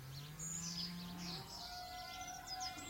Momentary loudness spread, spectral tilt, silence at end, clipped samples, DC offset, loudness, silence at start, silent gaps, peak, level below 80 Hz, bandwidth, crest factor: 5 LU; -2.5 dB/octave; 0 s; under 0.1%; under 0.1%; -46 LUFS; 0 s; none; -32 dBFS; -64 dBFS; 16.5 kHz; 16 dB